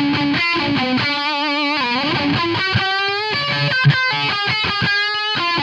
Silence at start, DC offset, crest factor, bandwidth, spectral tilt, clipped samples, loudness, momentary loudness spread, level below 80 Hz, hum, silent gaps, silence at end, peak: 0 s; under 0.1%; 16 dB; 9.2 kHz; -5.5 dB/octave; under 0.1%; -17 LUFS; 3 LU; -50 dBFS; none; none; 0 s; -2 dBFS